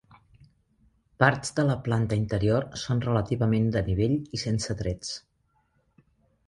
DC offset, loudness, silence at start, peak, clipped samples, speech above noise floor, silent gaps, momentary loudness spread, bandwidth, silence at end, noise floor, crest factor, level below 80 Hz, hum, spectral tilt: under 0.1%; -27 LUFS; 1.2 s; -4 dBFS; under 0.1%; 44 dB; none; 8 LU; 11.5 kHz; 1.3 s; -70 dBFS; 24 dB; -46 dBFS; none; -6 dB/octave